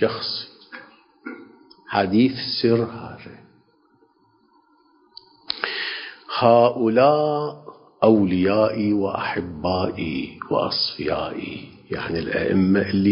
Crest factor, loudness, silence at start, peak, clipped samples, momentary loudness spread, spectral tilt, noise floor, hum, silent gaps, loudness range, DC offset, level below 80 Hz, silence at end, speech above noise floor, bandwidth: 20 dB; -21 LUFS; 0 s; -2 dBFS; under 0.1%; 21 LU; -10 dB/octave; -60 dBFS; none; none; 9 LU; under 0.1%; -50 dBFS; 0 s; 40 dB; 5.6 kHz